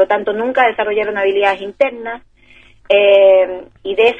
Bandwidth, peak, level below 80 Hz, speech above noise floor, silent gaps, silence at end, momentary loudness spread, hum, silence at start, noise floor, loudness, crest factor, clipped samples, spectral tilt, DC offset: 5 kHz; 0 dBFS; -52 dBFS; 32 dB; none; 0 s; 16 LU; none; 0 s; -46 dBFS; -13 LUFS; 14 dB; under 0.1%; -5 dB/octave; under 0.1%